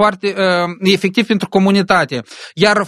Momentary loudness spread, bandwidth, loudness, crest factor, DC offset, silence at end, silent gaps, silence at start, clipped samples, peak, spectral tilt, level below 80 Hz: 6 LU; 13 kHz; -14 LUFS; 14 dB; under 0.1%; 0 s; none; 0 s; under 0.1%; 0 dBFS; -5.5 dB/octave; -52 dBFS